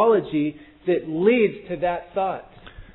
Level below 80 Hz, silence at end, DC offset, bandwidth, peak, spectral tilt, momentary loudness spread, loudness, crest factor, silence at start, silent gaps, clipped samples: -52 dBFS; 0.1 s; under 0.1%; 4.1 kHz; -6 dBFS; -10.5 dB/octave; 10 LU; -23 LUFS; 16 dB; 0 s; none; under 0.1%